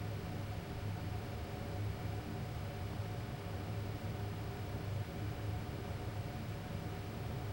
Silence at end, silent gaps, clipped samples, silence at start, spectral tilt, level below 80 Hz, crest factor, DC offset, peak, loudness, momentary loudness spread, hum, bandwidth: 0 s; none; under 0.1%; 0 s; -6.5 dB/octave; -52 dBFS; 12 dB; under 0.1%; -30 dBFS; -43 LUFS; 2 LU; none; 16 kHz